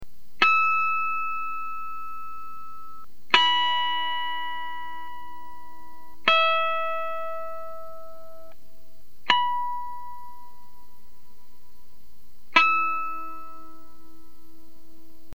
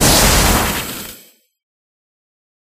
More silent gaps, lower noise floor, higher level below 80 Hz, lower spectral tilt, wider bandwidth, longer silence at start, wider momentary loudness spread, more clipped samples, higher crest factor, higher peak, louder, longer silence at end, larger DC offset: neither; first, -59 dBFS vs -45 dBFS; second, -62 dBFS vs -24 dBFS; about the same, -2 dB/octave vs -2.5 dB/octave; first, 19.5 kHz vs 15.5 kHz; about the same, 0 s vs 0 s; first, 24 LU vs 18 LU; neither; first, 28 dB vs 18 dB; about the same, 0 dBFS vs 0 dBFS; second, -24 LUFS vs -13 LUFS; about the same, 1.6 s vs 1.6 s; first, 3% vs under 0.1%